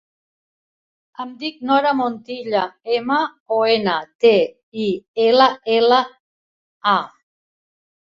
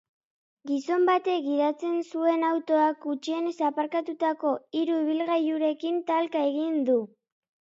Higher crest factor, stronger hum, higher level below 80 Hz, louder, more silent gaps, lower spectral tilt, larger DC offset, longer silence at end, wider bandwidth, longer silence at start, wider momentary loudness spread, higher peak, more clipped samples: about the same, 18 dB vs 14 dB; neither; first, -66 dBFS vs -86 dBFS; first, -18 LUFS vs -27 LUFS; first, 3.40-3.46 s, 4.15-4.19 s, 4.63-4.72 s, 5.08-5.14 s, 6.20-6.81 s vs none; about the same, -5.5 dB/octave vs -4.5 dB/octave; neither; first, 1.05 s vs 0.7 s; about the same, 7.2 kHz vs 7.6 kHz; first, 1.2 s vs 0.65 s; first, 13 LU vs 6 LU; first, -2 dBFS vs -12 dBFS; neither